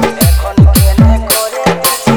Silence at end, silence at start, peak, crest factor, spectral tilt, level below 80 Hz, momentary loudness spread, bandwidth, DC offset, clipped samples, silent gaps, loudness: 0 s; 0 s; 0 dBFS; 8 dB; -5 dB/octave; -14 dBFS; 4 LU; over 20 kHz; under 0.1%; 3%; none; -9 LUFS